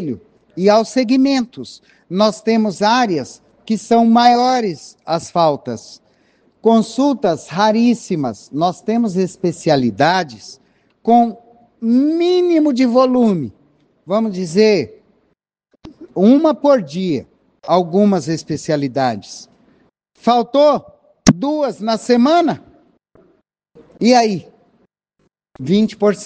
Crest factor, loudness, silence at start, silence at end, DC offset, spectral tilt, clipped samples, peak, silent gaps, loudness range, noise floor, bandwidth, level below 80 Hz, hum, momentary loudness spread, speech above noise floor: 16 dB; -15 LUFS; 0 s; 0 s; under 0.1%; -5.5 dB/octave; under 0.1%; 0 dBFS; none; 3 LU; -65 dBFS; 9.4 kHz; -52 dBFS; none; 14 LU; 51 dB